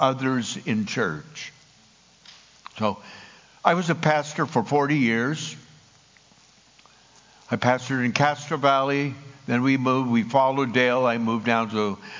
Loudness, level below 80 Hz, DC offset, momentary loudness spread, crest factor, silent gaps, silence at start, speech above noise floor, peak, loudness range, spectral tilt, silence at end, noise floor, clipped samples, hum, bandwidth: -23 LUFS; -66 dBFS; under 0.1%; 14 LU; 22 dB; none; 0 s; 33 dB; -2 dBFS; 7 LU; -5.5 dB/octave; 0 s; -56 dBFS; under 0.1%; none; 7.6 kHz